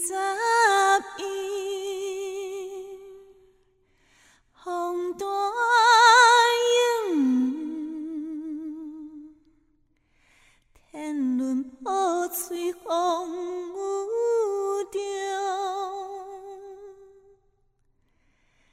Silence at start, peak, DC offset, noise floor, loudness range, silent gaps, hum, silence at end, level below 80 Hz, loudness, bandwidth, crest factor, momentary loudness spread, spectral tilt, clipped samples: 0 s; -4 dBFS; under 0.1%; -67 dBFS; 16 LU; none; none; 1.7 s; -68 dBFS; -24 LUFS; 16 kHz; 22 dB; 20 LU; -0.5 dB/octave; under 0.1%